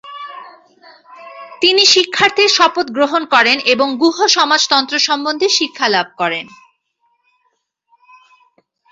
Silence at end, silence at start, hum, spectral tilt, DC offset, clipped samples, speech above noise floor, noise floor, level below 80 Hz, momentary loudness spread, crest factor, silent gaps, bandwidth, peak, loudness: 2.45 s; 0.05 s; none; -1 dB/octave; under 0.1%; under 0.1%; 52 dB; -66 dBFS; -62 dBFS; 17 LU; 16 dB; none; 8 kHz; 0 dBFS; -12 LUFS